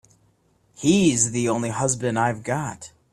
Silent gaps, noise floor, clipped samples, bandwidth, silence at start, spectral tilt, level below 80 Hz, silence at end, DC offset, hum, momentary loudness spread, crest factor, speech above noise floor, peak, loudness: none; -63 dBFS; under 0.1%; 13 kHz; 0.8 s; -4.5 dB/octave; -54 dBFS; 0.25 s; under 0.1%; none; 10 LU; 18 dB; 41 dB; -6 dBFS; -22 LUFS